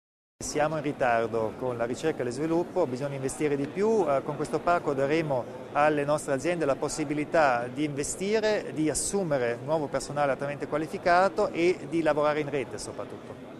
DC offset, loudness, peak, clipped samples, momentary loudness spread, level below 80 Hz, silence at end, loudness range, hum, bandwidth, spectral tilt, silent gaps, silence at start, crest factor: under 0.1%; -28 LUFS; -8 dBFS; under 0.1%; 7 LU; -56 dBFS; 0 s; 2 LU; none; 13.5 kHz; -5 dB/octave; none; 0.4 s; 18 dB